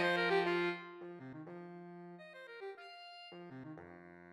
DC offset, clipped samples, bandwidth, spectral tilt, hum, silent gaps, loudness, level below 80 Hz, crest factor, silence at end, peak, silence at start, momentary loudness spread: under 0.1%; under 0.1%; 12 kHz; -5.5 dB/octave; none; none; -39 LUFS; -86 dBFS; 20 dB; 0 s; -22 dBFS; 0 s; 20 LU